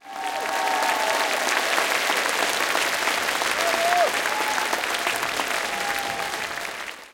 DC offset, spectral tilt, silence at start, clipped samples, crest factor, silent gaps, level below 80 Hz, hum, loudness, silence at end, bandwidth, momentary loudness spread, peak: under 0.1%; 0 dB/octave; 0.05 s; under 0.1%; 20 dB; none; -62 dBFS; none; -23 LUFS; 0 s; 17 kHz; 7 LU; -4 dBFS